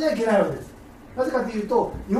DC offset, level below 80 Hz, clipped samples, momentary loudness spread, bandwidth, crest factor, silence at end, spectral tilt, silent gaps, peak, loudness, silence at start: under 0.1%; -46 dBFS; under 0.1%; 16 LU; 14.5 kHz; 16 dB; 0 s; -6.5 dB/octave; none; -8 dBFS; -23 LUFS; 0 s